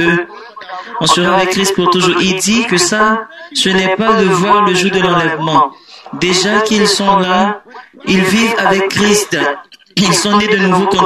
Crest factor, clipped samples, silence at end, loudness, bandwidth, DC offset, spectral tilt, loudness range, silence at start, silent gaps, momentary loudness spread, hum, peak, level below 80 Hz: 12 dB; under 0.1%; 0 s; -11 LUFS; 13.5 kHz; under 0.1%; -3.5 dB/octave; 1 LU; 0 s; none; 9 LU; none; 0 dBFS; -46 dBFS